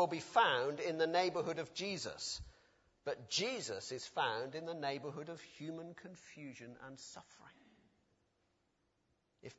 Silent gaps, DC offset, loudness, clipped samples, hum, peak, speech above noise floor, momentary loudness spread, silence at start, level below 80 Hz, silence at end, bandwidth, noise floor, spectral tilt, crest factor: none; under 0.1%; -39 LUFS; under 0.1%; none; -18 dBFS; 41 dB; 19 LU; 0 s; -70 dBFS; 0.05 s; 7.6 kHz; -81 dBFS; -2 dB/octave; 24 dB